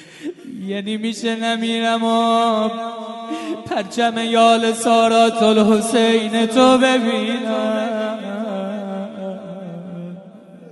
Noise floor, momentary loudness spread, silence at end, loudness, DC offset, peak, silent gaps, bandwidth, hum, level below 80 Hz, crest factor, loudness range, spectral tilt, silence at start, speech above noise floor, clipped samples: -40 dBFS; 18 LU; 0 s; -17 LUFS; under 0.1%; -2 dBFS; none; 11.5 kHz; none; -62 dBFS; 16 dB; 8 LU; -4 dB/octave; 0 s; 24 dB; under 0.1%